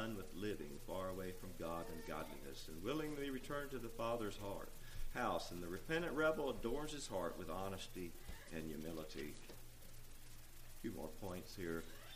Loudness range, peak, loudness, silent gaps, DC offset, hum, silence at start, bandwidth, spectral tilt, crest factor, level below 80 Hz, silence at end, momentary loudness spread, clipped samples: 8 LU; -26 dBFS; -46 LUFS; none; under 0.1%; none; 0 s; 15.5 kHz; -5 dB/octave; 20 dB; -54 dBFS; 0 s; 14 LU; under 0.1%